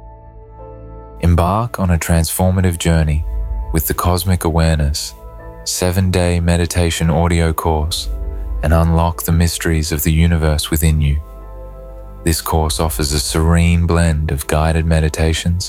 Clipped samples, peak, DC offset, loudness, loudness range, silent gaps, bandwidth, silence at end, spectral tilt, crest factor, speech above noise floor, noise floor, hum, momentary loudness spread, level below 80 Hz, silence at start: under 0.1%; -2 dBFS; under 0.1%; -16 LUFS; 2 LU; none; 16.5 kHz; 0 s; -5.5 dB/octave; 14 dB; 22 dB; -37 dBFS; none; 12 LU; -24 dBFS; 0 s